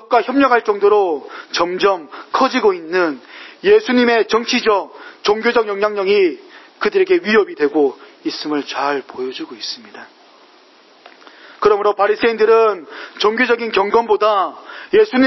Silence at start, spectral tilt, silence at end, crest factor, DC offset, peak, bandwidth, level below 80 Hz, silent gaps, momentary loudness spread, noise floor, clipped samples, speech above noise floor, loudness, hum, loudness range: 0.1 s; -4 dB/octave; 0 s; 16 dB; under 0.1%; 0 dBFS; 6.2 kHz; -58 dBFS; none; 12 LU; -48 dBFS; under 0.1%; 32 dB; -16 LUFS; none; 7 LU